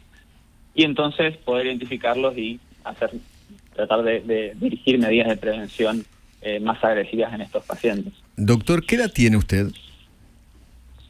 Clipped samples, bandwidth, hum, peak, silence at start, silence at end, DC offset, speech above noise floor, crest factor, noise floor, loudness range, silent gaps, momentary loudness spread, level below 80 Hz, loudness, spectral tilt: under 0.1%; 16 kHz; none; -2 dBFS; 0.75 s; 1.25 s; under 0.1%; 31 dB; 22 dB; -53 dBFS; 3 LU; none; 12 LU; -42 dBFS; -22 LUFS; -6 dB/octave